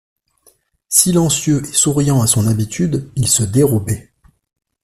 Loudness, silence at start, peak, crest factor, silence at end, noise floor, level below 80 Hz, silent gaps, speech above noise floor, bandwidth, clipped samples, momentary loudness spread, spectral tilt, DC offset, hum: -14 LUFS; 0.9 s; 0 dBFS; 16 dB; 0.85 s; -55 dBFS; -44 dBFS; none; 41 dB; 16 kHz; under 0.1%; 7 LU; -4.5 dB/octave; under 0.1%; none